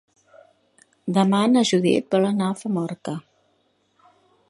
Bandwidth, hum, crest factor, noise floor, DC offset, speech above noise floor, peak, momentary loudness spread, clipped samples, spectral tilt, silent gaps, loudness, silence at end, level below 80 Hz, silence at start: 11.5 kHz; none; 18 dB; -66 dBFS; under 0.1%; 46 dB; -4 dBFS; 15 LU; under 0.1%; -6 dB/octave; none; -21 LUFS; 1.3 s; -70 dBFS; 1.05 s